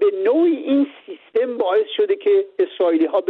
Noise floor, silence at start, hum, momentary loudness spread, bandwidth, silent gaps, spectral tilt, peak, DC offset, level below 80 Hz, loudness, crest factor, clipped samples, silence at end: -38 dBFS; 0 s; none; 7 LU; 4.2 kHz; none; -7 dB/octave; -8 dBFS; under 0.1%; -74 dBFS; -19 LUFS; 10 dB; under 0.1%; 0 s